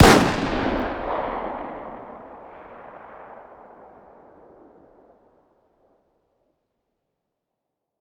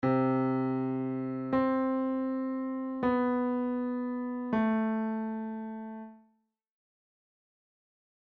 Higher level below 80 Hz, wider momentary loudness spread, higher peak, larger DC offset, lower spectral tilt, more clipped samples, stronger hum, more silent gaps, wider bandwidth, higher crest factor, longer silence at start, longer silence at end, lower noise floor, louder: first, -38 dBFS vs -66 dBFS; first, 23 LU vs 10 LU; first, 0 dBFS vs -18 dBFS; neither; second, -5 dB/octave vs -10.5 dB/octave; neither; neither; neither; first, over 20 kHz vs 4.6 kHz; first, 26 dB vs 14 dB; about the same, 0 s vs 0 s; first, 4.45 s vs 2.1 s; first, -82 dBFS vs -75 dBFS; first, -23 LUFS vs -31 LUFS